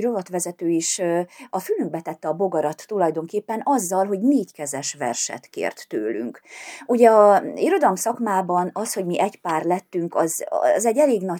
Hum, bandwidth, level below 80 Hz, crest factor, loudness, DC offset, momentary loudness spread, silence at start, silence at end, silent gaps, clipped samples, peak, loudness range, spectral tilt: none; 20 kHz; -82 dBFS; 20 dB; -22 LUFS; under 0.1%; 11 LU; 0 s; 0 s; none; under 0.1%; -2 dBFS; 5 LU; -4.5 dB/octave